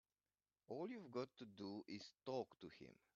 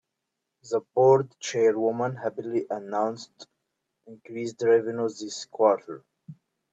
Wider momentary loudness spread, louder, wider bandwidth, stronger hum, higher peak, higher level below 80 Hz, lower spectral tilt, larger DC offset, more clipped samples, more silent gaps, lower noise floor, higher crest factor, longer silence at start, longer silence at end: second, 10 LU vs 16 LU; second, -53 LUFS vs -26 LUFS; second, 7.2 kHz vs 8 kHz; neither; second, -34 dBFS vs -6 dBFS; second, -90 dBFS vs -78 dBFS; about the same, -5 dB/octave vs -5.5 dB/octave; neither; neither; neither; first, under -90 dBFS vs -83 dBFS; about the same, 20 dB vs 20 dB; about the same, 0.7 s vs 0.65 s; second, 0.2 s vs 0.4 s